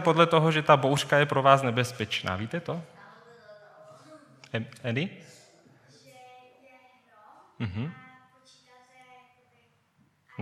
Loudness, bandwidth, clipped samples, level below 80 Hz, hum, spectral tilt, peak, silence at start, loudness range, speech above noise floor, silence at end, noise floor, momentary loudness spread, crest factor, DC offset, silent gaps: -26 LUFS; 15.5 kHz; under 0.1%; -68 dBFS; none; -5.5 dB/octave; -4 dBFS; 0 s; 17 LU; 42 dB; 0 s; -67 dBFS; 17 LU; 26 dB; under 0.1%; none